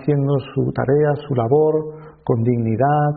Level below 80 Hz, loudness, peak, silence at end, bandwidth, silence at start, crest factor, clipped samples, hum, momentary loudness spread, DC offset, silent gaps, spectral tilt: -50 dBFS; -19 LUFS; -4 dBFS; 0 s; 4.7 kHz; 0 s; 14 dB; under 0.1%; none; 7 LU; under 0.1%; none; -8.5 dB/octave